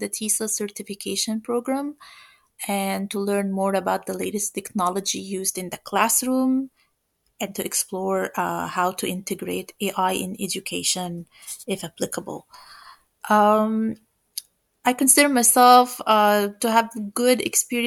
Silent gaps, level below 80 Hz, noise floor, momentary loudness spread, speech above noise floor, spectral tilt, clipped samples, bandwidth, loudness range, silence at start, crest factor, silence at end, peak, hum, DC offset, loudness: none; -68 dBFS; -71 dBFS; 16 LU; 49 dB; -3 dB/octave; under 0.1%; 19 kHz; 9 LU; 0 s; 22 dB; 0 s; -2 dBFS; none; under 0.1%; -22 LUFS